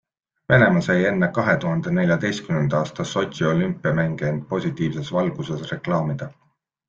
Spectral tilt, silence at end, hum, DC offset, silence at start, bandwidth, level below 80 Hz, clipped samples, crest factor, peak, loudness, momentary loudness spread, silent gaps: -7 dB/octave; 0.55 s; none; under 0.1%; 0.5 s; 7.4 kHz; -54 dBFS; under 0.1%; 20 dB; -2 dBFS; -22 LUFS; 9 LU; none